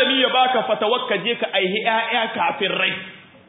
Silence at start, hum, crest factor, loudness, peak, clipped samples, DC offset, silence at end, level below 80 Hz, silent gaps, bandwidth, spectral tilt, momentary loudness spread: 0 s; none; 16 dB; -19 LUFS; -4 dBFS; under 0.1%; under 0.1%; 0.3 s; -70 dBFS; none; 4 kHz; -8.5 dB/octave; 5 LU